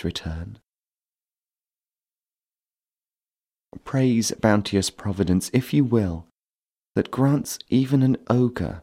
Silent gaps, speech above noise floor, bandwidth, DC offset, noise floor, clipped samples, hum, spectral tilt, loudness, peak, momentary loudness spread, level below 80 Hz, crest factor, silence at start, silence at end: 0.69-0.73 s, 6.46-6.59 s; over 68 dB; 16 kHz; under 0.1%; under -90 dBFS; under 0.1%; none; -6 dB/octave; -22 LUFS; -4 dBFS; 11 LU; -48 dBFS; 20 dB; 0 s; 0 s